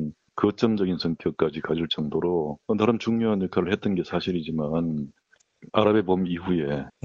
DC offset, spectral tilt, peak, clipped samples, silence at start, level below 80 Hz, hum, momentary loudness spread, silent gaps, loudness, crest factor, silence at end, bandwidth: under 0.1%; -7.5 dB/octave; -4 dBFS; under 0.1%; 0 s; -54 dBFS; none; 5 LU; none; -25 LUFS; 22 dB; 0.15 s; 7.2 kHz